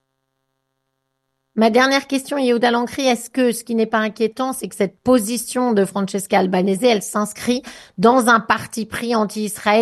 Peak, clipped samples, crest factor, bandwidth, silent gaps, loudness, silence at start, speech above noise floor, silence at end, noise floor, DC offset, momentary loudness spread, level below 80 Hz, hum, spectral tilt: 0 dBFS; under 0.1%; 18 dB; 12.5 kHz; none; -18 LUFS; 1.55 s; 55 dB; 0 s; -73 dBFS; under 0.1%; 8 LU; -58 dBFS; none; -4.5 dB/octave